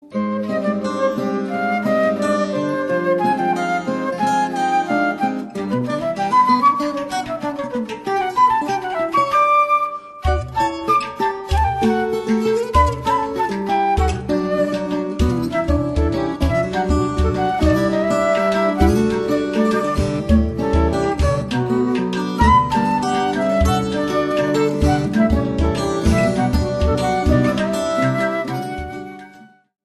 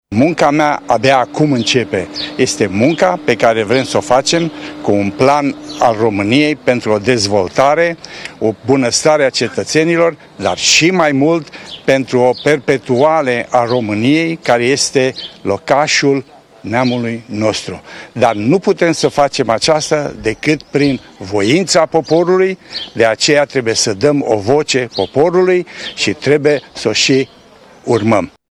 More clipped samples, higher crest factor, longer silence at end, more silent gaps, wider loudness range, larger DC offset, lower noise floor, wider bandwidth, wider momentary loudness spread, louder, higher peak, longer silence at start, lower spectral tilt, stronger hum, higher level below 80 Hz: neither; about the same, 18 dB vs 14 dB; first, 0.4 s vs 0.2 s; neither; about the same, 2 LU vs 2 LU; neither; first, -45 dBFS vs -41 dBFS; about the same, 13 kHz vs 13.5 kHz; about the same, 6 LU vs 8 LU; second, -18 LUFS vs -13 LUFS; about the same, 0 dBFS vs 0 dBFS; about the same, 0.05 s vs 0.1 s; first, -6.5 dB/octave vs -4 dB/octave; neither; first, -28 dBFS vs -48 dBFS